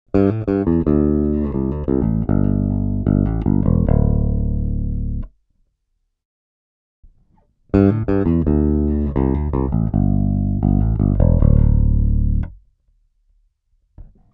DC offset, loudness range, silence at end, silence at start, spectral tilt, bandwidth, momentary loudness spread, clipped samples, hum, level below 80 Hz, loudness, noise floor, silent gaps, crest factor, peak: under 0.1%; 6 LU; 0.25 s; 0.15 s; -13 dB/octave; 3.5 kHz; 7 LU; under 0.1%; none; -22 dBFS; -18 LUFS; -71 dBFS; 6.25-7.03 s; 18 dB; 0 dBFS